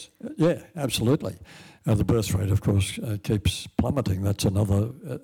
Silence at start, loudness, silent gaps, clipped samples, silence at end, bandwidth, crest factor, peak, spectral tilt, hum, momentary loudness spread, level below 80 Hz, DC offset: 0 s; -25 LUFS; none; under 0.1%; 0.05 s; 17.5 kHz; 12 dB; -14 dBFS; -6 dB/octave; none; 8 LU; -46 dBFS; under 0.1%